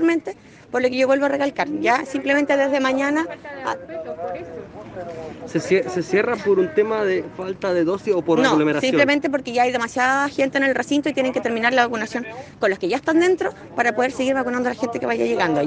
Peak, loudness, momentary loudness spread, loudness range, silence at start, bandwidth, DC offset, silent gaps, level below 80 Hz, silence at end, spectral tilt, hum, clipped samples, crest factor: -2 dBFS; -20 LUFS; 12 LU; 5 LU; 0 s; 9.8 kHz; under 0.1%; none; -60 dBFS; 0 s; -5 dB/octave; none; under 0.1%; 18 dB